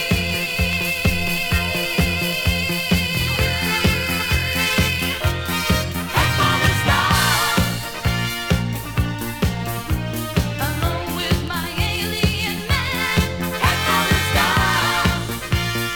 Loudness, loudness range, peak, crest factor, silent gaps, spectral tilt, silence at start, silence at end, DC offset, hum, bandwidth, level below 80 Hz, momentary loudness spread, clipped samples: -19 LUFS; 4 LU; -2 dBFS; 18 dB; none; -4 dB/octave; 0 s; 0 s; under 0.1%; none; over 20 kHz; -30 dBFS; 7 LU; under 0.1%